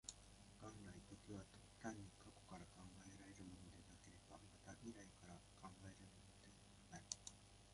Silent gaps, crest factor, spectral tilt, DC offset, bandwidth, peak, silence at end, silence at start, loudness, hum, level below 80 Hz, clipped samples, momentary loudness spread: none; 30 dB; -3.5 dB/octave; under 0.1%; 11.5 kHz; -30 dBFS; 0 s; 0.05 s; -60 LUFS; none; -72 dBFS; under 0.1%; 10 LU